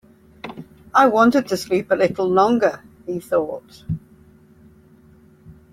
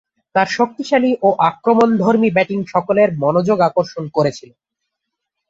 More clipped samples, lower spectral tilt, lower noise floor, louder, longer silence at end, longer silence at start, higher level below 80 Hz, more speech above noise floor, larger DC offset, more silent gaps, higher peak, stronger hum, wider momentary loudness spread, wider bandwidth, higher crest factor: neither; about the same, -6 dB/octave vs -6.5 dB/octave; second, -50 dBFS vs -78 dBFS; second, -19 LUFS vs -16 LUFS; second, 0.2 s vs 1.1 s; about the same, 0.45 s vs 0.35 s; about the same, -56 dBFS vs -60 dBFS; second, 32 dB vs 63 dB; neither; neither; about the same, -2 dBFS vs -2 dBFS; neither; first, 21 LU vs 6 LU; first, 16 kHz vs 7.8 kHz; about the same, 18 dB vs 16 dB